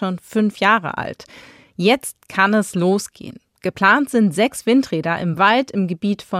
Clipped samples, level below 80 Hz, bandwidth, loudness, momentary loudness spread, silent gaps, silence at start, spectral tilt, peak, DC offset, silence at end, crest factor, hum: under 0.1%; -60 dBFS; 15 kHz; -18 LUFS; 13 LU; none; 0 s; -5 dB/octave; -2 dBFS; under 0.1%; 0 s; 18 dB; none